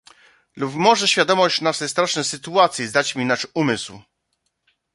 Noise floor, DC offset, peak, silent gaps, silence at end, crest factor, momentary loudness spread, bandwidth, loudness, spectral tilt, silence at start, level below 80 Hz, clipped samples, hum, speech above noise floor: -73 dBFS; under 0.1%; -2 dBFS; none; 0.95 s; 20 dB; 9 LU; 11.5 kHz; -19 LUFS; -3 dB/octave; 0.55 s; -64 dBFS; under 0.1%; none; 53 dB